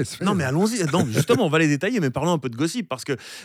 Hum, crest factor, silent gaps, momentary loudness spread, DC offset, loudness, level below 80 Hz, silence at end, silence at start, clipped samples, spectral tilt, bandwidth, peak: none; 16 dB; none; 9 LU; under 0.1%; -22 LUFS; -58 dBFS; 0 s; 0 s; under 0.1%; -5.5 dB/octave; 16 kHz; -6 dBFS